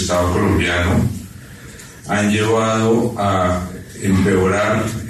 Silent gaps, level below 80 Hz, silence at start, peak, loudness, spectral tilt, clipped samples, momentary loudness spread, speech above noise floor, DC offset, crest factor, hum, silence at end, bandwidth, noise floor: none; -36 dBFS; 0 s; -4 dBFS; -17 LUFS; -5.5 dB/octave; under 0.1%; 19 LU; 21 dB; under 0.1%; 14 dB; none; 0 s; 13.5 kHz; -37 dBFS